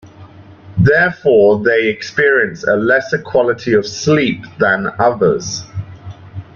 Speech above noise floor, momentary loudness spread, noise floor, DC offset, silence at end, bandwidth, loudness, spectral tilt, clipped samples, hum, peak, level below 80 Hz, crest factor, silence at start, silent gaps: 25 dB; 15 LU; -38 dBFS; under 0.1%; 0.15 s; 7.2 kHz; -14 LUFS; -5.5 dB/octave; under 0.1%; none; 0 dBFS; -46 dBFS; 14 dB; 0.05 s; none